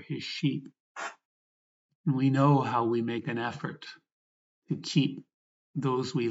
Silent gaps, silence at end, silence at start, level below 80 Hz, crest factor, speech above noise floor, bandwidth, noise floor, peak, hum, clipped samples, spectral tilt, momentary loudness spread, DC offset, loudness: 0.80-0.95 s, 1.25-1.89 s, 1.95-2.04 s, 4.12-4.62 s, 5.34-5.74 s; 0 s; 0 s; -84 dBFS; 18 dB; over 62 dB; 8 kHz; under -90 dBFS; -12 dBFS; none; under 0.1%; -6.5 dB/octave; 16 LU; under 0.1%; -30 LUFS